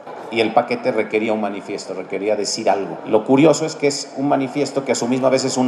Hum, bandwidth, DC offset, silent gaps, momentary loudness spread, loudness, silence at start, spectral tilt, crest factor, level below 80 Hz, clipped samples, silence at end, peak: none; 12 kHz; under 0.1%; none; 10 LU; -19 LUFS; 0 s; -4.5 dB/octave; 18 dB; -74 dBFS; under 0.1%; 0 s; 0 dBFS